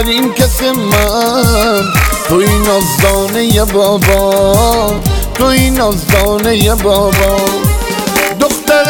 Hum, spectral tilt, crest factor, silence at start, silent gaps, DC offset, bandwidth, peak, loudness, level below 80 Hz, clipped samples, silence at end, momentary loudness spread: none; -4.5 dB/octave; 10 dB; 0 s; none; 0.2%; over 20 kHz; 0 dBFS; -10 LUFS; -18 dBFS; under 0.1%; 0 s; 3 LU